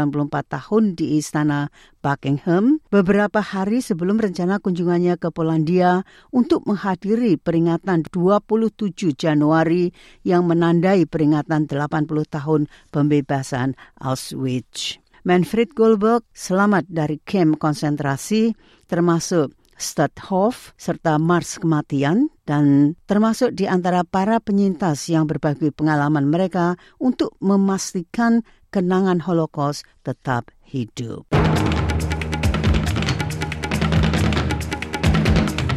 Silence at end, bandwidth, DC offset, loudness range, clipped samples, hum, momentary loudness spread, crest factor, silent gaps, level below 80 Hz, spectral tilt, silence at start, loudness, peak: 0 s; 13.5 kHz; under 0.1%; 3 LU; under 0.1%; none; 8 LU; 14 dB; none; -38 dBFS; -6.5 dB/octave; 0 s; -20 LUFS; -4 dBFS